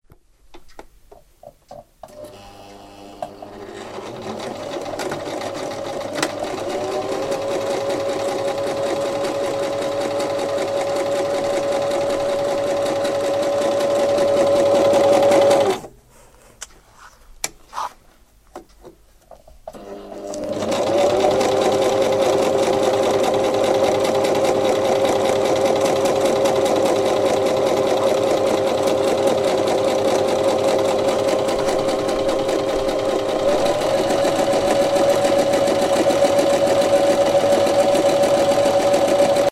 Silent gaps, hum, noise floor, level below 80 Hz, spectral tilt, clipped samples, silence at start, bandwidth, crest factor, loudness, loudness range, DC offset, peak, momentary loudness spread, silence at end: none; none; -51 dBFS; -48 dBFS; -4 dB/octave; under 0.1%; 0.5 s; 15.5 kHz; 16 dB; -19 LUFS; 15 LU; under 0.1%; -2 dBFS; 13 LU; 0 s